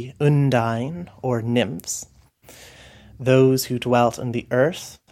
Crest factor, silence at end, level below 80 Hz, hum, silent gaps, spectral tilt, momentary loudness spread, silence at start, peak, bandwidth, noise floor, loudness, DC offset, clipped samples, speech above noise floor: 18 dB; 0.15 s; -56 dBFS; none; none; -6 dB/octave; 12 LU; 0 s; -4 dBFS; 15.5 kHz; -49 dBFS; -21 LUFS; under 0.1%; under 0.1%; 28 dB